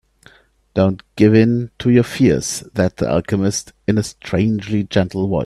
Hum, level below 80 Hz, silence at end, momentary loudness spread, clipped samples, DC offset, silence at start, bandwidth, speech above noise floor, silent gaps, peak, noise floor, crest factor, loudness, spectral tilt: none; -44 dBFS; 0 s; 7 LU; under 0.1%; under 0.1%; 0.75 s; 13.5 kHz; 34 dB; none; 0 dBFS; -50 dBFS; 16 dB; -17 LUFS; -6 dB/octave